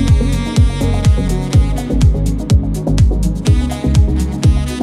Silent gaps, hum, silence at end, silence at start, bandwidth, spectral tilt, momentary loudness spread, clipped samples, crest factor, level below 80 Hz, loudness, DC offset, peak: none; none; 0 s; 0 s; 13.5 kHz; -7 dB/octave; 3 LU; under 0.1%; 12 dB; -16 dBFS; -14 LUFS; under 0.1%; 0 dBFS